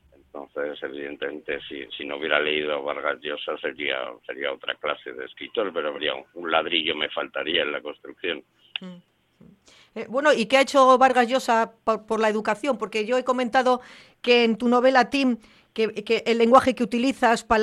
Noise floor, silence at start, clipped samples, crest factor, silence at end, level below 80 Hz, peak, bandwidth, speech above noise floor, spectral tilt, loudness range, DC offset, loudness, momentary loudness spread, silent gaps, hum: -55 dBFS; 0.35 s; under 0.1%; 20 dB; 0 s; -58 dBFS; -4 dBFS; 12.5 kHz; 31 dB; -3.5 dB/octave; 8 LU; under 0.1%; -23 LUFS; 16 LU; none; none